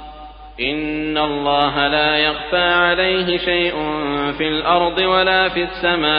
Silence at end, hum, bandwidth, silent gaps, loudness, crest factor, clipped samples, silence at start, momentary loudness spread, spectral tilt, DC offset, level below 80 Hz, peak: 0 s; none; 5.2 kHz; none; -17 LUFS; 16 dB; under 0.1%; 0 s; 7 LU; -1 dB/octave; under 0.1%; -40 dBFS; -2 dBFS